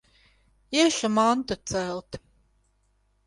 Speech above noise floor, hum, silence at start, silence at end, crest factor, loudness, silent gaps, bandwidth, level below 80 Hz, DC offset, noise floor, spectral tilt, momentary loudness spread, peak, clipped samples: 43 dB; 50 Hz at -60 dBFS; 0.7 s; 1.1 s; 20 dB; -25 LUFS; none; 11.5 kHz; -56 dBFS; under 0.1%; -68 dBFS; -3.5 dB/octave; 17 LU; -8 dBFS; under 0.1%